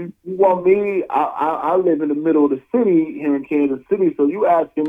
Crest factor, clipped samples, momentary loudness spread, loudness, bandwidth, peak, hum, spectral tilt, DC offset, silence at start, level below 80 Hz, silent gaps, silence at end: 14 dB; under 0.1%; 4 LU; -18 LUFS; 3.7 kHz; -2 dBFS; none; -9.5 dB/octave; under 0.1%; 0 s; -62 dBFS; none; 0 s